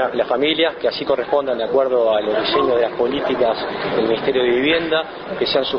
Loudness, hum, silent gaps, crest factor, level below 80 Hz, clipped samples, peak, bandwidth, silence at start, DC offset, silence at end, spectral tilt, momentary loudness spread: -18 LUFS; none; none; 16 dB; -52 dBFS; under 0.1%; -4 dBFS; 6.2 kHz; 0 s; under 0.1%; 0 s; -7 dB/octave; 5 LU